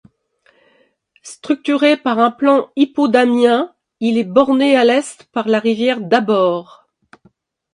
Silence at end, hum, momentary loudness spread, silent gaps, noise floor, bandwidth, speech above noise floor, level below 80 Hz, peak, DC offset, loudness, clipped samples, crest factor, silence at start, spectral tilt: 1.1 s; none; 10 LU; none; -58 dBFS; 11 kHz; 44 dB; -66 dBFS; 0 dBFS; under 0.1%; -15 LUFS; under 0.1%; 16 dB; 1.25 s; -5 dB/octave